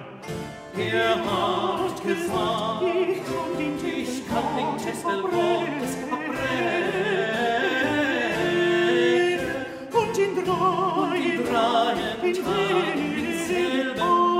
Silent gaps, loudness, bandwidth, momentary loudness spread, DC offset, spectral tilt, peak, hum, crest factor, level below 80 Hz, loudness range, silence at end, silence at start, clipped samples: none; -24 LUFS; 16 kHz; 7 LU; under 0.1%; -4.5 dB/octave; -8 dBFS; none; 16 dB; -56 dBFS; 3 LU; 0 s; 0 s; under 0.1%